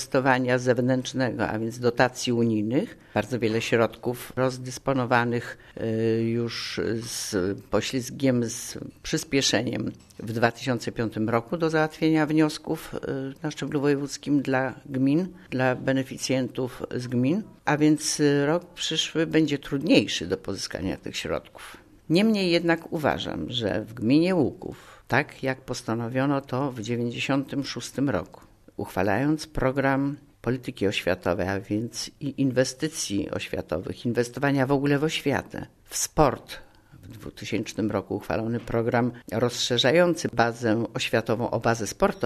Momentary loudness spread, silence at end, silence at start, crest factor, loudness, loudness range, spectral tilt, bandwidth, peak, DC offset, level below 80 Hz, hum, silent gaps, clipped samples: 10 LU; 0 s; 0 s; 22 dB; -26 LUFS; 4 LU; -5 dB/octave; 13.5 kHz; -2 dBFS; under 0.1%; -52 dBFS; none; none; under 0.1%